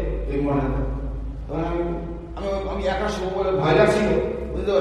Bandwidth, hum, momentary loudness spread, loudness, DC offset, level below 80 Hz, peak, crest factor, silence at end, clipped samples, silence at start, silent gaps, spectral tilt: 11.5 kHz; none; 13 LU; -24 LUFS; under 0.1%; -32 dBFS; -4 dBFS; 18 dB; 0 s; under 0.1%; 0 s; none; -7 dB/octave